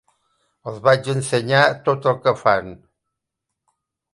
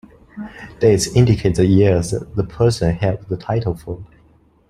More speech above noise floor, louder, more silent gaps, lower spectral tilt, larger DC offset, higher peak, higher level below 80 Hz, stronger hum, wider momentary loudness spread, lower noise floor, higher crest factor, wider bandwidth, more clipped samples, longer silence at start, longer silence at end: first, 63 dB vs 36 dB; about the same, -18 LUFS vs -17 LUFS; neither; second, -5 dB/octave vs -6.5 dB/octave; neither; about the same, 0 dBFS vs -2 dBFS; second, -58 dBFS vs -38 dBFS; neither; second, 15 LU vs 19 LU; first, -81 dBFS vs -53 dBFS; first, 22 dB vs 16 dB; second, 11.5 kHz vs 13 kHz; neither; first, 0.65 s vs 0.35 s; first, 1.35 s vs 0.65 s